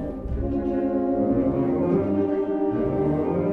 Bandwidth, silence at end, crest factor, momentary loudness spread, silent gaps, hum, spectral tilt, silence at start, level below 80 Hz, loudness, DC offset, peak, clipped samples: 4.1 kHz; 0 s; 12 dB; 4 LU; none; none; -11 dB/octave; 0 s; -38 dBFS; -24 LUFS; under 0.1%; -10 dBFS; under 0.1%